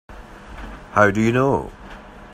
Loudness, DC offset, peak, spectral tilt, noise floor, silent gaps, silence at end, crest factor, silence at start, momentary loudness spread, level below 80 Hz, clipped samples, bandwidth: -18 LUFS; under 0.1%; 0 dBFS; -7 dB/octave; -39 dBFS; none; 0.05 s; 22 dB; 0.1 s; 24 LU; -42 dBFS; under 0.1%; 15.5 kHz